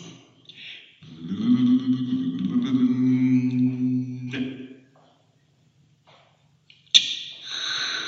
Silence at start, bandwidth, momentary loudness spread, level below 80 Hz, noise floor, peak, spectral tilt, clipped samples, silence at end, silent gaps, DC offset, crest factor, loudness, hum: 0 s; 7.8 kHz; 22 LU; -74 dBFS; -62 dBFS; 0 dBFS; -4 dB/octave; under 0.1%; 0 s; none; under 0.1%; 24 dB; -23 LUFS; none